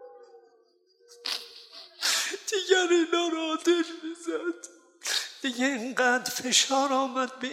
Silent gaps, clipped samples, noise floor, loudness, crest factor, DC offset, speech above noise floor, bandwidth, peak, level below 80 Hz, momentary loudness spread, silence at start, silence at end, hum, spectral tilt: none; under 0.1%; -64 dBFS; -27 LUFS; 20 dB; under 0.1%; 37 dB; 16.5 kHz; -8 dBFS; -82 dBFS; 14 LU; 0 s; 0 s; none; -0.5 dB/octave